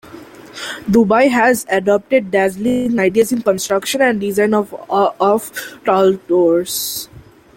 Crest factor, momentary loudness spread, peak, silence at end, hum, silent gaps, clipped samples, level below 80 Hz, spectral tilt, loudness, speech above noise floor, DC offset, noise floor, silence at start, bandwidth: 14 dB; 10 LU; -2 dBFS; 0.35 s; none; none; under 0.1%; -52 dBFS; -4.5 dB/octave; -15 LUFS; 22 dB; under 0.1%; -37 dBFS; 0.05 s; 17 kHz